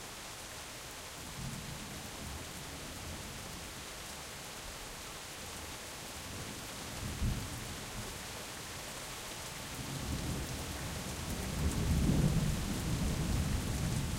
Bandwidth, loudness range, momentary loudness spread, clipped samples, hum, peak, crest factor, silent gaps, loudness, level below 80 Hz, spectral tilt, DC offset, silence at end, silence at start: 16 kHz; 9 LU; 10 LU; under 0.1%; none; -18 dBFS; 20 dB; none; -39 LUFS; -44 dBFS; -4.5 dB/octave; under 0.1%; 0 s; 0 s